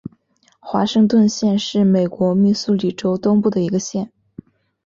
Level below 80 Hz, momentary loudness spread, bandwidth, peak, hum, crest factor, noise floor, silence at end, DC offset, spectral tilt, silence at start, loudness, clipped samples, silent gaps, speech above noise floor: -58 dBFS; 10 LU; 7.6 kHz; -4 dBFS; none; 14 dB; -58 dBFS; 0.8 s; under 0.1%; -6.5 dB/octave; 0.65 s; -17 LUFS; under 0.1%; none; 42 dB